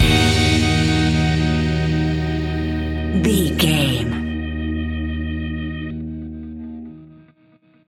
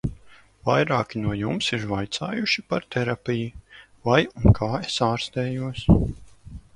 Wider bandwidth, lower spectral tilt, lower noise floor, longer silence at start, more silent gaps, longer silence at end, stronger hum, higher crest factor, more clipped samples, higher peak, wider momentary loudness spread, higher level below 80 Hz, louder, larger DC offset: first, 16.5 kHz vs 11 kHz; about the same, -5.5 dB/octave vs -6 dB/octave; about the same, -54 dBFS vs -51 dBFS; about the same, 0 s vs 0.05 s; neither; first, 0.65 s vs 0.15 s; neither; second, 16 dB vs 22 dB; neither; about the same, -2 dBFS vs -2 dBFS; first, 16 LU vs 10 LU; first, -28 dBFS vs -38 dBFS; first, -19 LUFS vs -24 LUFS; neither